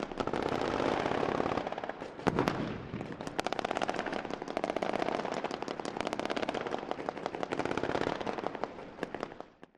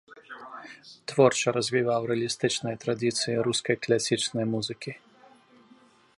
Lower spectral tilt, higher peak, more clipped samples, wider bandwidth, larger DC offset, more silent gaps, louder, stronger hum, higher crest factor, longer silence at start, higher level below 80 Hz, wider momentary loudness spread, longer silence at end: first, -5.5 dB/octave vs -4 dB/octave; about the same, -6 dBFS vs -6 dBFS; neither; first, 13 kHz vs 11.5 kHz; neither; neither; second, -35 LUFS vs -26 LUFS; neither; first, 30 dB vs 22 dB; about the same, 0 s vs 0.1 s; first, -58 dBFS vs -70 dBFS; second, 9 LU vs 20 LU; second, 0.15 s vs 1.2 s